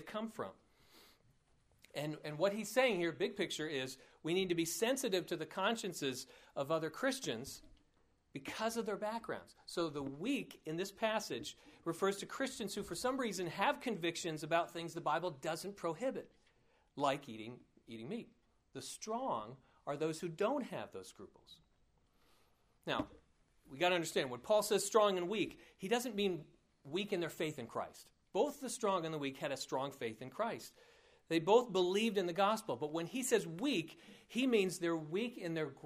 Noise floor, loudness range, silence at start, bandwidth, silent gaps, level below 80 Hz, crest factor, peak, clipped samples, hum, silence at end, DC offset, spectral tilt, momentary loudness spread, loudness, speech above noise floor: -74 dBFS; 8 LU; 0 s; 15.5 kHz; none; -74 dBFS; 22 dB; -18 dBFS; under 0.1%; none; 0.05 s; under 0.1%; -4 dB/octave; 15 LU; -38 LUFS; 36 dB